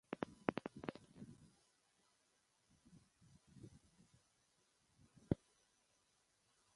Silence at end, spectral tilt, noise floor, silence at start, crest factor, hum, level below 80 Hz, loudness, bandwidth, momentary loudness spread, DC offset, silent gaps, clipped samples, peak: 1.4 s; -7 dB/octave; -80 dBFS; 0.1 s; 36 dB; none; -70 dBFS; -47 LUFS; 11.5 kHz; 25 LU; under 0.1%; none; under 0.1%; -16 dBFS